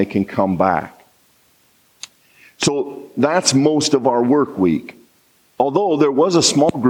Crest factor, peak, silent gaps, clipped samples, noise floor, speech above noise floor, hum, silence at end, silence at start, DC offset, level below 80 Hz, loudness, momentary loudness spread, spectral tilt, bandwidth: 18 dB; 0 dBFS; none; under 0.1%; -57 dBFS; 41 dB; none; 0 s; 0 s; under 0.1%; -58 dBFS; -17 LUFS; 14 LU; -4.5 dB/octave; 16 kHz